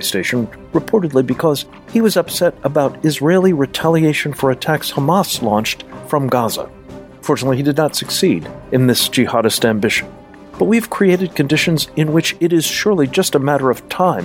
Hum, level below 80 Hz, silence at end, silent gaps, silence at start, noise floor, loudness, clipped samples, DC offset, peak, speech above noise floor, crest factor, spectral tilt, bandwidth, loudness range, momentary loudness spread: none; -48 dBFS; 0 s; none; 0 s; -35 dBFS; -16 LUFS; under 0.1%; under 0.1%; 0 dBFS; 20 dB; 14 dB; -5 dB/octave; 16.5 kHz; 3 LU; 6 LU